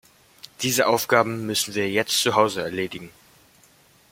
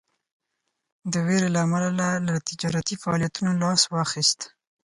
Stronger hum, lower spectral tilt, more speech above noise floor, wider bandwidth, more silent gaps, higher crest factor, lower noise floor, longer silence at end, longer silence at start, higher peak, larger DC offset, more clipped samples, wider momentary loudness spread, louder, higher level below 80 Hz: neither; about the same, -3 dB/octave vs -4 dB/octave; second, 34 dB vs 55 dB; first, 16.5 kHz vs 11.5 kHz; neither; about the same, 22 dB vs 18 dB; second, -56 dBFS vs -79 dBFS; first, 1 s vs 0.4 s; second, 0.45 s vs 1.05 s; first, -2 dBFS vs -6 dBFS; neither; neither; first, 10 LU vs 7 LU; about the same, -22 LUFS vs -24 LUFS; about the same, -64 dBFS vs -60 dBFS